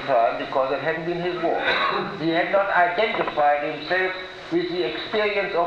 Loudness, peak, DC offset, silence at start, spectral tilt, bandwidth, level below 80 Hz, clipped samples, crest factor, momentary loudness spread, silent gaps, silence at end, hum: -23 LUFS; -8 dBFS; under 0.1%; 0 s; -6 dB/octave; 8 kHz; -58 dBFS; under 0.1%; 16 dB; 6 LU; none; 0 s; none